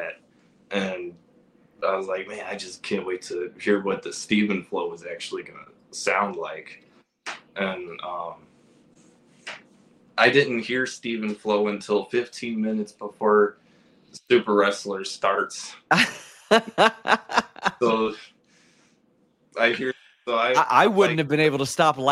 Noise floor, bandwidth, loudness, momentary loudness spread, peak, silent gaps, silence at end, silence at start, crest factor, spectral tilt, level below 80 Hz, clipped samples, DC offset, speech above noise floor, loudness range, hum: -64 dBFS; 14 kHz; -24 LUFS; 17 LU; -2 dBFS; none; 0 s; 0 s; 24 dB; -4 dB/octave; -70 dBFS; under 0.1%; under 0.1%; 40 dB; 8 LU; none